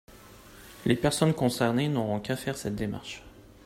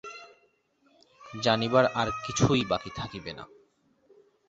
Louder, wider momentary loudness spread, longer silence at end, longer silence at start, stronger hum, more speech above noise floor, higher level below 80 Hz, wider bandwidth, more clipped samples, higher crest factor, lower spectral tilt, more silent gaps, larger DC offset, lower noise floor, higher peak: about the same, -28 LUFS vs -27 LUFS; second, 17 LU vs 21 LU; second, 0.25 s vs 1.05 s; about the same, 0.1 s vs 0.05 s; neither; second, 23 dB vs 41 dB; about the same, -54 dBFS vs -54 dBFS; first, 16 kHz vs 8 kHz; neither; about the same, 20 dB vs 22 dB; about the same, -5.5 dB/octave vs -5 dB/octave; neither; neither; second, -50 dBFS vs -68 dBFS; about the same, -10 dBFS vs -8 dBFS